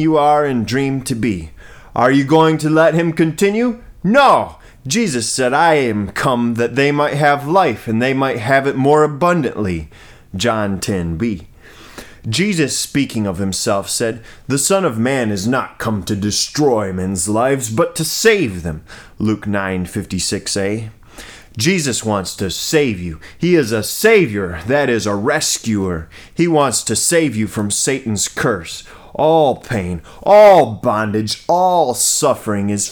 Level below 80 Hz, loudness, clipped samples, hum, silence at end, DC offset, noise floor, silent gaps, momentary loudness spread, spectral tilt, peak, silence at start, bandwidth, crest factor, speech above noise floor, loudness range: -44 dBFS; -15 LUFS; under 0.1%; none; 0 s; under 0.1%; -38 dBFS; none; 10 LU; -4.5 dB/octave; 0 dBFS; 0 s; over 20 kHz; 16 dB; 23 dB; 6 LU